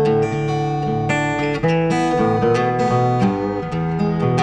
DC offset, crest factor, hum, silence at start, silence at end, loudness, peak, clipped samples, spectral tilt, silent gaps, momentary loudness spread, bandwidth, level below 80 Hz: under 0.1%; 14 dB; none; 0 s; 0 s; -19 LUFS; -4 dBFS; under 0.1%; -7 dB/octave; none; 4 LU; 9.8 kHz; -42 dBFS